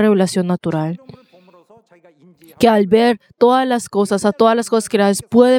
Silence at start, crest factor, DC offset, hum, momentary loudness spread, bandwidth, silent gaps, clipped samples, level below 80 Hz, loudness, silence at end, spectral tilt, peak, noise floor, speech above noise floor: 0 s; 16 dB; under 0.1%; none; 7 LU; 16.5 kHz; none; under 0.1%; -56 dBFS; -15 LUFS; 0 s; -5.5 dB/octave; 0 dBFS; -49 dBFS; 35 dB